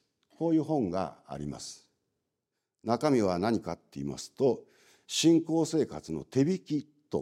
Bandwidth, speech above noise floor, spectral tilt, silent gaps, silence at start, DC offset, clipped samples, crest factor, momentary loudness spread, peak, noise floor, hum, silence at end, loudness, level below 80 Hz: 14 kHz; 56 dB; -5.5 dB/octave; none; 0.4 s; under 0.1%; under 0.1%; 20 dB; 13 LU; -12 dBFS; -86 dBFS; none; 0 s; -30 LUFS; -64 dBFS